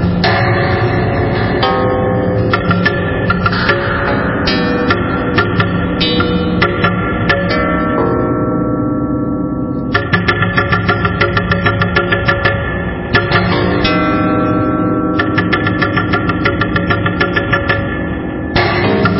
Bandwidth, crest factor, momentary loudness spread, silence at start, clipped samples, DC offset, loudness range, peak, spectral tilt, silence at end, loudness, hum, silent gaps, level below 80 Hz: 5.8 kHz; 12 dB; 3 LU; 0 s; under 0.1%; under 0.1%; 1 LU; -2 dBFS; -10.5 dB/octave; 0 s; -13 LUFS; none; none; -28 dBFS